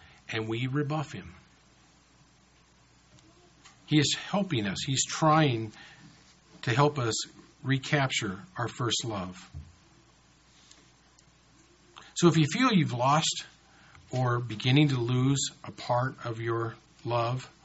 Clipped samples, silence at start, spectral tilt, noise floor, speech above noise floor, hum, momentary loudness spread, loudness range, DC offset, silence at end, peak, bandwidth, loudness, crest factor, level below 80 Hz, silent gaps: under 0.1%; 0.3 s; -4.5 dB/octave; -61 dBFS; 34 dB; none; 16 LU; 10 LU; under 0.1%; 0.15 s; -8 dBFS; 8 kHz; -28 LUFS; 22 dB; -62 dBFS; none